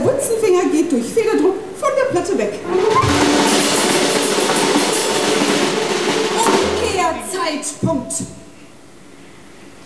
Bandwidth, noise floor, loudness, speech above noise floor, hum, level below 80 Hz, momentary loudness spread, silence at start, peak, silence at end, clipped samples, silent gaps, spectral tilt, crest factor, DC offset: 11 kHz; -42 dBFS; -16 LUFS; 23 dB; none; -46 dBFS; 7 LU; 0 s; -2 dBFS; 0.1 s; under 0.1%; none; -3.5 dB/octave; 14 dB; 0.7%